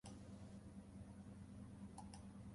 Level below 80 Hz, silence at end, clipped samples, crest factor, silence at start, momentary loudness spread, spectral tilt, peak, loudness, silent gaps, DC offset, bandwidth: -66 dBFS; 0 s; under 0.1%; 14 dB; 0.05 s; 2 LU; -6 dB/octave; -42 dBFS; -58 LUFS; none; under 0.1%; 11.5 kHz